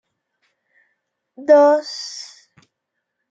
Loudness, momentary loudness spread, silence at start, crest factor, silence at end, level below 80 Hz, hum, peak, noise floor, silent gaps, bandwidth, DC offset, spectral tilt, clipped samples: -16 LUFS; 21 LU; 1.4 s; 18 dB; 1.1 s; -84 dBFS; none; -2 dBFS; -78 dBFS; none; 7.8 kHz; under 0.1%; -2 dB/octave; under 0.1%